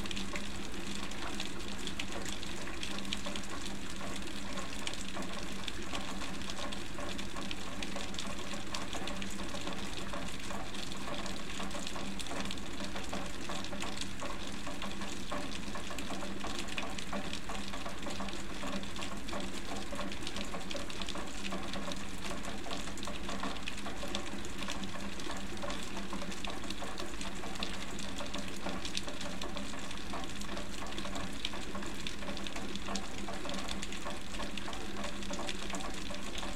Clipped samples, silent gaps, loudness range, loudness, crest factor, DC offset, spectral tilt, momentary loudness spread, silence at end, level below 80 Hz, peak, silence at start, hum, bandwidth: under 0.1%; none; 0 LU; -40 LUFS; 26 dB; 2%; -3.5 dB/octave; 2 LU; 0 s; -50 dBFS; -14 dBFS; 0 s; none; 16.5 kHz